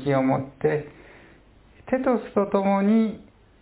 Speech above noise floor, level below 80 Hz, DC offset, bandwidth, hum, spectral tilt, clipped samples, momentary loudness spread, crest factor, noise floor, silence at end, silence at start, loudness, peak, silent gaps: 31 dB; -56 dBFS; under 0.1%; 4 kHz; none; -12 dB/octave; under 0.1%; 9 LU; 16 dB; -53 dBFS; 0.4 s; 0 s; -23 LUFS; -8 dBFS; none